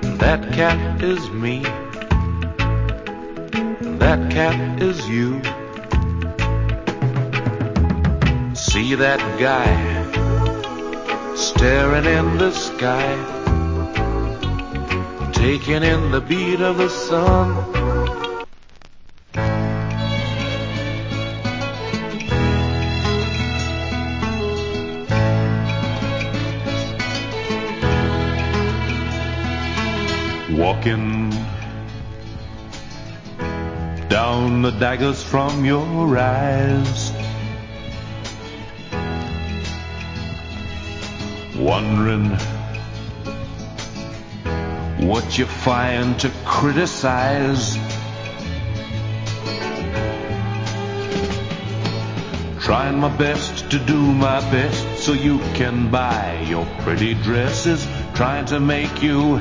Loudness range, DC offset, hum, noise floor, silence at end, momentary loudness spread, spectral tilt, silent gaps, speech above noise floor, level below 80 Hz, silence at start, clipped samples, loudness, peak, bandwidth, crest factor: 6 LU; under 0.1%; none; -40 dBFS; 0 s; 12 LU; -6 dB/octave; none; 22 dB; -28 dBFS; 0 s; under 0.1%; -20 LUFS; 0 dBFS; 7.6 kHz; 20 dB